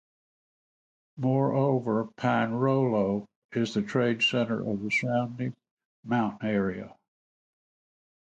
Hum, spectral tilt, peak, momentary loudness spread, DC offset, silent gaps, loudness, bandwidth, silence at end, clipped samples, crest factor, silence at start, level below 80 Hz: none; -6.5 dB/octave; -12 dBFS; 9 LU; under 0.1%; 3.36-3.49 s, 5.71-5.77 s, 5.85-6.03 s; -28 LUFS; 8.8 kHz; 1.35 s; under 0.1%; 18 dB; 1.15 s; -66 dBFS